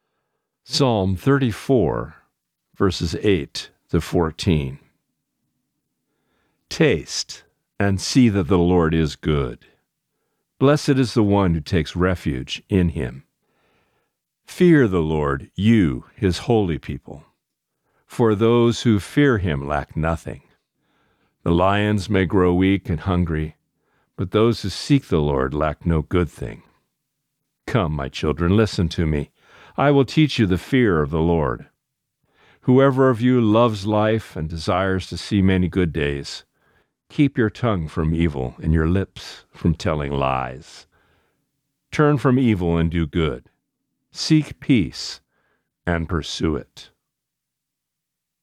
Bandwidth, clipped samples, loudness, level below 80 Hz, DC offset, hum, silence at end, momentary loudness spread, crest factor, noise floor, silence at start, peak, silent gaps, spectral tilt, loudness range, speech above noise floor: 14.5 kHz; under 0.1%; -20 LUFS; -38 dBFS; under 0.1%; none; 1.6 s; 13 LU; 18 dB; -82 dBFS; 0.7 s; -4 dBFS; none; -6.5 dB/octave; 5 LU; 62 dB